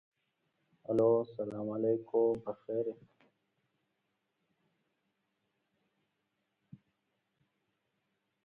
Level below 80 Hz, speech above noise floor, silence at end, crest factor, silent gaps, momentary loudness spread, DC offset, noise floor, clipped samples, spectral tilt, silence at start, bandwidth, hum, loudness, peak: -76 dBFS; 50 dB; 5.5 s; 22 dB; none; 12 LU; under 0.1%; -83 dBFS; under 0.1%; -10 dB/octave; 0.9 s; 4.2 kHz; none; -33 LUFS; -16 dBFS